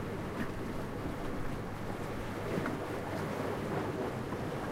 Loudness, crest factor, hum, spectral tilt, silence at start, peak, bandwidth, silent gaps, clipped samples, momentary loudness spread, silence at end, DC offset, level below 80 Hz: -38 LUFS; 16 dB; none; -6.5 dB/octave; 0 s; -20 dBFS; 16 kHz; none; under 0.1%; 4 LU; 0 s; under 0.1%; -50 dBFS